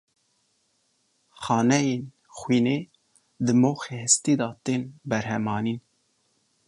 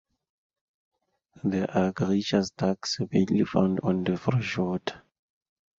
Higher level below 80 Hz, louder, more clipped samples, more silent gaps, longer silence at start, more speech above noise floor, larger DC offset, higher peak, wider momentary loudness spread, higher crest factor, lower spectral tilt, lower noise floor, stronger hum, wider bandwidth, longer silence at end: second, -64 dBFS vs -56 dBFS; first, -24 LUFS vs -27 LUFS; neither; neither; about the same, 1.4 s vs 1.45 s; first, 46 dB vs 34 dB; neither; about the same, -6 dBFS vs -8 dBFS; first, 14 LU vs 5 LU; about the same, 20 dB vs 20 dB; second, -4.5 dB/octave vs -6.5 dB/octave; first, -70 dBFS vs -60 dBFS; neither; first, 11.5 kHz vs 7.8 kHz; about the same, 0.9 s vs 0.8 s